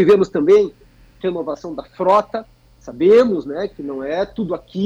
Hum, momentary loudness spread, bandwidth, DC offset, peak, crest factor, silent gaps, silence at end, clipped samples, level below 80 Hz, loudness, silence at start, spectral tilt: none; 15 LU; 7.6 kHz; under 0.1%; -4 dBFS; 12 dB; none; 0 s; under 0.1%; -50 dBFS; -17 LUFS; 0 s; -7 dB/octave